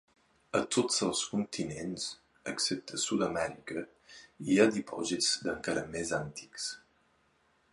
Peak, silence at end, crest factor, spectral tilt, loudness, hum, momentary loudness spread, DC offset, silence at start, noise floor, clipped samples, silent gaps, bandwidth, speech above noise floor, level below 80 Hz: -10 dBFS; 0.95 s; 24 dB; -3 dB/octave; -32 LUFS; none; 14 LU; under 0.1%; 0.55 s; -71 dBFS; under 0.1%; none; 11.5 kHz; 38 dB; -66 dBFS